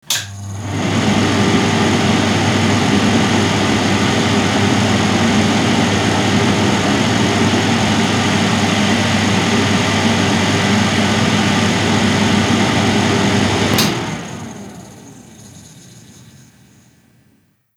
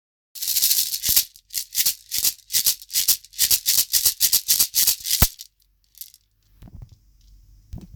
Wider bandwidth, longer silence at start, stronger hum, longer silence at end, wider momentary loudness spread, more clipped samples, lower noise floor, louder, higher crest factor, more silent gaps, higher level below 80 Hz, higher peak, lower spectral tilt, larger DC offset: second, 17.5 kHz vs over 20 kHz; second, 0.1 s vs 0.35 s; neither; first, 1.75 s vs 0.1 s; about the same, 4 LU vs 5 LU; neither; second, -56 dBFS vs -62 dBFS; first, -14 LUFS vs -18 LUFS; second, 14 dB vs 24 dB; neither; about the same, -42 dBFS vs -42 dBFS; about the same, -2 dBFS vs 0 dBFS; first, -4.5 dB/octave vs 0.5 dB/octave; neither